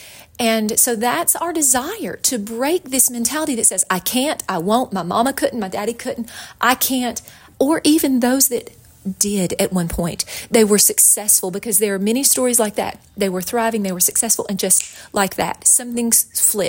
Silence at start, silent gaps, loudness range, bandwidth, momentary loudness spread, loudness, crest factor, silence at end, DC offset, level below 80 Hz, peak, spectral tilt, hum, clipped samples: 0 s; none; 5 LU; 17 kHz; 10 LU; -16 LUFS; 18 dB; 0 s; under 0.1%; -48 dBFS; 0 dBFS; -2.5 dB/octave; none; under 0.1%